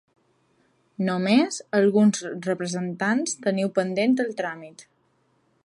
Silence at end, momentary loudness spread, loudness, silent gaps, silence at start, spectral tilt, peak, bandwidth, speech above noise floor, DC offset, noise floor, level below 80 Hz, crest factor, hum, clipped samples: 0.85 s; 9 LU; -24 LUFS; none; 1 s; -5 dB/octave; -8 dBFS; 11 kHz; 44 dB; under 0.1%; -67 dBFS; -74 dBFS; 16 dB; none; under 0.1%